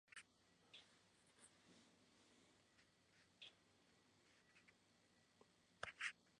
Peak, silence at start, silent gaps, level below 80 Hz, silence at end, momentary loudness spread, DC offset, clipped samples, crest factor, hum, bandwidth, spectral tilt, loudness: -34 dBFS; 0.05 s; none; under -90 dBFS; 0 s; 19 LU; under 0.1%; under 0.1%; 30 dB; none; 10.5 kHz; -1 dB/octave; -56 LUFS